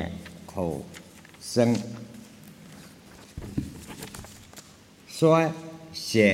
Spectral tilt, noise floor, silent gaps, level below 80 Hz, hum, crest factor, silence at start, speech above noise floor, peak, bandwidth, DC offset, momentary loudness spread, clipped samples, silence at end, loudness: -5.5 dB/octave; -52 dBFS; none; -54 dBFS; none; 22 dB; 0 s; 28 dB; -6 dBFS; 16.5 kHz; under 0.1%; 25 LU; under 0.1%; 0 s; -27 LUFS